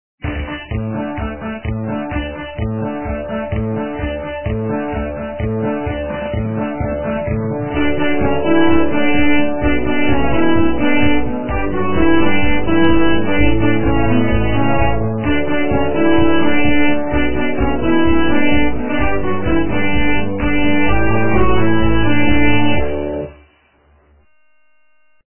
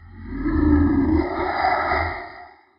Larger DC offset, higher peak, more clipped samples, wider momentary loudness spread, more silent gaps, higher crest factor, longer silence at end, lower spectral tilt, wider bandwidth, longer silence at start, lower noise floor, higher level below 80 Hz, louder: neither; first, 0 dBFS vs -6 dBFS; neither; second, 9 LU vs 14 LU; neither; about the same, 14 dB vs 14 dB; second, 0.05 s vs 0.3 s; about the same, -10.5 dB/octave vs -10.5 dB/octave; second, 3.2 kHz vs 5.6 kHz; first, 0.15 s vs 0 s; first, -62 dBFS vs -43 dBFS; about the same, -28 dBFS vs -30 dBFS; first, -17 LUFS vs -21 LUFS